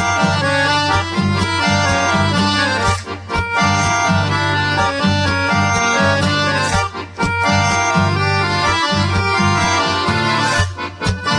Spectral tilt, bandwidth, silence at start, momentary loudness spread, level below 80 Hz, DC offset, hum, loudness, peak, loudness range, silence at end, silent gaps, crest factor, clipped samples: -4 dB/octave; 10.5 kHz; 0 s; 4 LU; -36 dBFS; under 0.1%; none; -15 LUFS; -2 dBFS; 1 LU; 0 s; none; 14 dB; under 0.1%